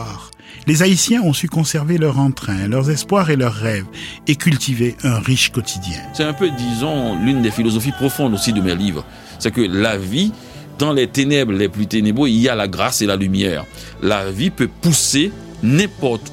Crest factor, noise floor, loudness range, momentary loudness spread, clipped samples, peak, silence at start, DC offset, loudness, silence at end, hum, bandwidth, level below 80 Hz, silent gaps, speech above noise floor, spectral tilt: 16 dB; -37 dBFS; 2 LU; 9 LU; under 0.1%; -2 dBFS; 0 s; under 0.1%; -17 LUFS; 0 s; none; 16.5 kHz; -42 dBFS; none; 21 dB; -4.5 dB/octave